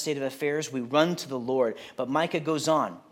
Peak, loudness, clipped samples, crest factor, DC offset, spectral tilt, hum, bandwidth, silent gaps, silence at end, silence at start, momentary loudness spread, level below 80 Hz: -8 dBFS; -27 LUFS; under 0.1%; 20 dB; under 0.1%; -4.5 dB/octave; none; 17 kHz; none; 0.1 s; 0 s; 6 LU; -76 dBFS